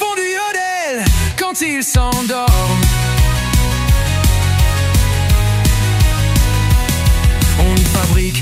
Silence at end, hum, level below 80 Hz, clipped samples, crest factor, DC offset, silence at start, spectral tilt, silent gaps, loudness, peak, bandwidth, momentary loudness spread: 0 s; none; -16 dBFS; under 0.1%; 12 dB; under 0.1%; 0 s; -4.5 dB/octave; none; -14 LUFS; -2 dBFS; 16.5 kHz; 4 LU